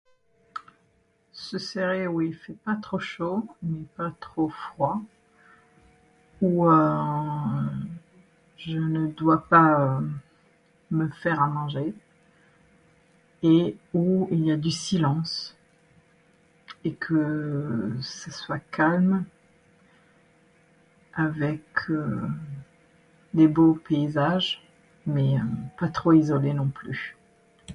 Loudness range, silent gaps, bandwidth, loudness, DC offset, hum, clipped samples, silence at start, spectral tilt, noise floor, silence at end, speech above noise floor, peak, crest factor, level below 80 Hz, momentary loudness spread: 7 LU; none; 10.5 kHz; -25 LUFS; under 0.1%; none; under 0.1%; 0.55 s; -7 dB/octave; -66 dBFS; 0 s; 42 dB; -6 dBFS; 20 dB; -60 dBFS; 15 LU